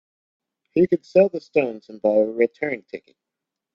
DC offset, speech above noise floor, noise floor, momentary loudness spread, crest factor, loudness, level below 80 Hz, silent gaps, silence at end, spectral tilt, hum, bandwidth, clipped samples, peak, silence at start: under 0.1%; 64 dB; -85 dBFS; 12 LU; 18 dB; -21 LUFS; -64 dBFS; none; 0.75 s; -8.5 dB/octave; none; 7 kHz; under 0.1%; -4 dBFS; 0.75 s